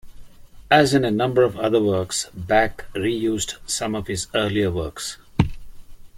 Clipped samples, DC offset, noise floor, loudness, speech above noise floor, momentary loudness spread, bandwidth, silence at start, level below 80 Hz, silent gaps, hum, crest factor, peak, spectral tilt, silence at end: under 0.1%; under 0.1%; -41 dBFS; -21 LUFS; 20 dB; 9 LU; 16.5 kHz; 0.05 s; -42 dBFS; none; none; 20 dB; -2 dBFS; -4.5 dB/octave; 0 s